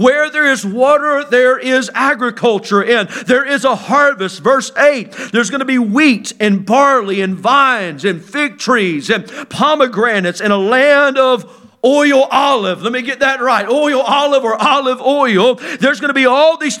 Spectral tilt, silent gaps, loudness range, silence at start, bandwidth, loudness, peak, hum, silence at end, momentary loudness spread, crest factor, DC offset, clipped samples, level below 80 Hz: -4 dB/octave; none; 1 LU; 0 s; 13.5 kHz; -12 LUFS; 0 dBFS; none; 0 s; 6 LU; 12 dB; under 0.1%; under 0.1%; -62 dBFS